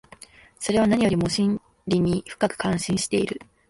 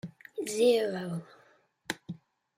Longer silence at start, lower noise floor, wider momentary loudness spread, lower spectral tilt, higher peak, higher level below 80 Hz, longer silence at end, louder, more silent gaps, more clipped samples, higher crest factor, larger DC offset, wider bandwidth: first, 0.6 s vs 0.05 s; second, -49 dBFS vs -65 dBFS; second, 7 LU vs 21 LU; about the same, -5.5 dB/octave vs -4.5 dB/octave; first, -6 dBFS vs -12 dBFS; first, -50 dBFS vs -78 dBFS; second, 0.25 s vs 0.4 s; first, -24 LUFS vs -31 LUFS; neither; neither; about the same, 18 dB vs 20 dB; neither; second, 11.5 kHz vs 16 kHz